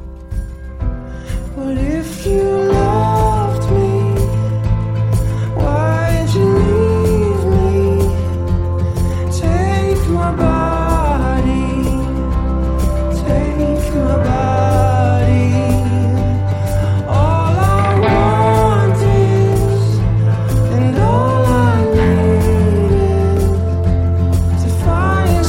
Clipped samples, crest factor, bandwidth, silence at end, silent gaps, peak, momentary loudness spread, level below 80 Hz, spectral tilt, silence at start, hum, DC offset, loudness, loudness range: under 0.1%; 12 dB; 16 kHz; 0 s; none; -2 dBFS; 6 LU; -22 dBFS; -7.5 dB/octave; 0 s; none; 0.4%; -15 LUFS; 3 LU